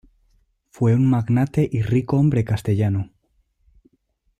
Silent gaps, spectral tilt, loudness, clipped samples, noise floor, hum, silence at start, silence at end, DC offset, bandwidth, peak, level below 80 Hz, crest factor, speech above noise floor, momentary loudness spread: none; -9 dB/octave; -20 LUFS; under 0.1%; -67 dBFS; none; 0.8 s; 1.3 s; under 0.1%; 12 kHz; -8 dBFS; -48 dBFS; 14 dB; 49 dB; 5 LU